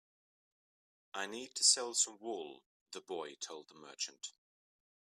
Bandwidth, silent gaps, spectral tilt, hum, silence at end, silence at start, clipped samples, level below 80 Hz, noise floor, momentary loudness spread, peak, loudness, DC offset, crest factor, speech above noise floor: 15 kHz; 2.66-2.86 s; 1 dB/octave; none; 0.75 s; 1.15 s; under 0.1%; under -90 dBFS; under -90 dBFS; 23 LU; -14 dBFS; -35 LUFS; under 0.1%; 26 dB; over 51 dB